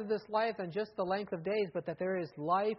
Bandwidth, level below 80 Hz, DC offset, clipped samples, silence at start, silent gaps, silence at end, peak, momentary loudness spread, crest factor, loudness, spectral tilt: 5.8 kHz; -74 dBFS; under 0.1%; under 0.1%; 0 s; none; 0 s; -18 dBFS; 4 LU; 16 dB; -35 LUFS; -4.5 dB/octave